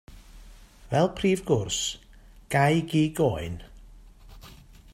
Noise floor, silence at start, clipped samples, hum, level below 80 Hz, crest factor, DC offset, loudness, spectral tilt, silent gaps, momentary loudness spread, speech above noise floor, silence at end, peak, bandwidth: -49 dBFS; 0.1 s; under 0.1%; none; -48 dBFS; 20 dB; under 0.1%; -26 LUFS; -5 dB/octave; none; 13 LU; 24 dB; 0.4 s; -8 dBFS; 16 kHz